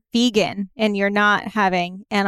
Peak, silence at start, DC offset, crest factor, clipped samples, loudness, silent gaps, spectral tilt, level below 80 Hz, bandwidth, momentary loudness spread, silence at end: -6 dBFS; 0.15 s; under 0.1%; 14 dB; under 0.1%; -19 LUFS; none; -4.5 dB/octave; -56 dBFS; 14 kHz; 6 LU; 0 s